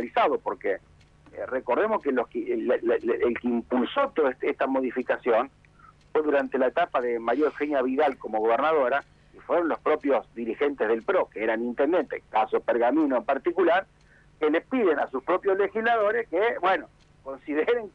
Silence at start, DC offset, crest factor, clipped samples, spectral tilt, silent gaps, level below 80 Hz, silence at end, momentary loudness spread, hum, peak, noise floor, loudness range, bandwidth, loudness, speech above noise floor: 0 s; under 0.1%; 14 dB; under 0.1%; -6.5 dB/octave; none; -62 dBFS; 0.05 s; 6 LU; 50 Hz at -60 dBFS; -12 dBFS; -55 dBFS; 2 LU; 6.2 kHz; -26 LUFS; 30 dB